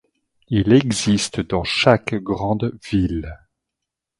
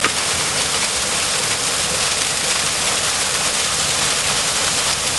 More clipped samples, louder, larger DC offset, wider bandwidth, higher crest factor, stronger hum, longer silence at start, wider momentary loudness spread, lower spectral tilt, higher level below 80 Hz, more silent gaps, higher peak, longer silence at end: neither; second, -19 LUFS vs -16 LUFS; second, under 0.1% vs 0.2%; about the same, 11.5 kHz vs 12.5 kHz; about the same, 20 dB vs 18 dB; neither; first, 0.5 s vs 0 s; first, 8 LU vs 1 LU; first, -5.5 dB/octave vs 0 dB/octave; about the same, -40 dBFS vs -44 dBFS; neither; about the same, 0 dBFS vs 0 dBFS; first, 0.85 s vs 0 s